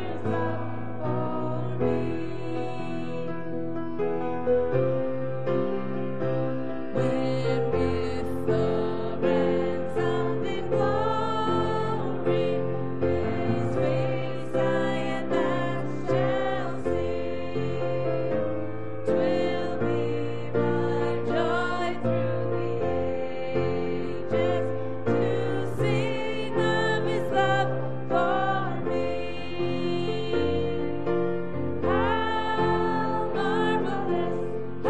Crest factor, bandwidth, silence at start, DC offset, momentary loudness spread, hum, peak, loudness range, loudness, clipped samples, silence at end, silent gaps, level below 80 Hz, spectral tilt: 14 dB; 10 kHz; 0 s; 3%; 6 LU; none; -12 dBFS; 2 LU; -27 LUFS; under 0.1%; 0 s; none; -52 dBFS; -7.5 dB/octave